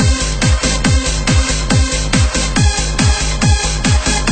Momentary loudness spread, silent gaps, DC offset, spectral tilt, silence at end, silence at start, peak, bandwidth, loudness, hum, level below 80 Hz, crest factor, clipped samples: 1 LU; none; under 0.1%; -4 dB/octave; 0 s; 0 s; 0 dBFS; 9.2 kHz; -14 LUFS; none; -16 dBFS; 12 dB; under 0.1%